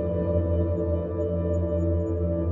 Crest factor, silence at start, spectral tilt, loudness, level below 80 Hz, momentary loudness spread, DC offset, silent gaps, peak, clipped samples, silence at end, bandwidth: 12 dB; 0 s; -11.5 dB/octave; -26 LUFS; -40 dBFS; 2 LU; under 0.1%; none; -12 dBFS; under 0.1%; 0 s; 3.2 kHz